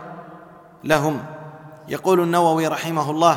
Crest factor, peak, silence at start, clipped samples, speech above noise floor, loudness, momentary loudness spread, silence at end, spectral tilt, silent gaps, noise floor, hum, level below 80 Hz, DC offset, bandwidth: 18 dB; -2 dBFS; 0 s; under 0.1%; 25 dB; -20 LUFS; 22 LU; 0 s; -5.5 dB/octave; none; -44 dBFS; none; -58 dBFS; under 0.1%; 17.5 kHz